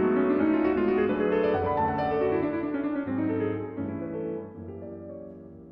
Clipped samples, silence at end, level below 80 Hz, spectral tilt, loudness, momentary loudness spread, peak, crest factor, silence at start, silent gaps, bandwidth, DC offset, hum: under 0.1%; 0 s; -56 dBFS; -10.5 dB/octave; -27 LUFS; 16 LU; -14 dBFS; 14 dB; 0 s; none; 5.4 kHz; under 0.1%; none